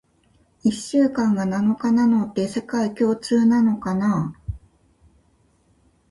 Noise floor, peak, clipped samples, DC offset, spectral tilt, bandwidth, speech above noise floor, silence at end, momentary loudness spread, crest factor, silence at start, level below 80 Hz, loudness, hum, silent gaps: -61 dBFS; -8 dBFS; under 0.1%; under 0.1%; -6.5 dB/octave; 11.5 kHz; 41 dB; 1.55 s; 8 LU; 14 dB; 0.65 s; -48 dBFS; -21 LUFS; none; none